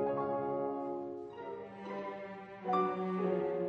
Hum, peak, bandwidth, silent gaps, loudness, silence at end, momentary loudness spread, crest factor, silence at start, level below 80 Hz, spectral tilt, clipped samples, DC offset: none; -22 dBFS; 6.6 kHz; none; -38 LUFS; 0 s; 12 LU; 16 dB; 0 s; -76 dBFS; -9 dB/octave; under 0.1%; under 0.1%